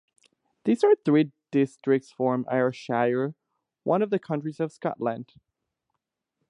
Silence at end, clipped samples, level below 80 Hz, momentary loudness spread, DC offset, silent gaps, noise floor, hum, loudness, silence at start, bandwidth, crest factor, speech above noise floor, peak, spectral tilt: 1.25 s; under 0.1%; -78 dBFS; 10 LU; under 0.1%; none; -83 dBFS; none; -26 LUFS; 0.65 s; 10.5 kHz; 18 dB; 58 dB; -10 dBFS; -8 dB/octave